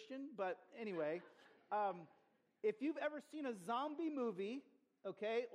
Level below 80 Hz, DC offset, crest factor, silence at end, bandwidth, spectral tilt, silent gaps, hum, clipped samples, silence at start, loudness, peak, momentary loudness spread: under -90 dBFS; under 0.1%; 18 dB; 0 s; 12.5 kHz; -6 dB/octave; none; none; under 0.1%; 0 s; -45 LUFS; -28 dBFS; 11 LU